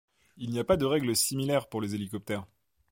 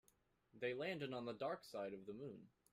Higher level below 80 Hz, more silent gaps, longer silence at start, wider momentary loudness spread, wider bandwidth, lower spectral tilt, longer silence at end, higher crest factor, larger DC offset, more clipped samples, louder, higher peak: first, -56 dBFS vs -84 dBFS; neither; second, 0.35 s vs 0.55 s; about the same, 11 LU vs 9 LU; first, 17 kHz vs 15 kHz; second, -4.5 dB/octave vs -6 dB/octave; first, 0.45 s vs 0.25 s; about the same, 20 dB vs 18 dB; neither; neither; first, -29 LUFS vs -48 LUFS; first, -12 dBFS vs -32 dBFS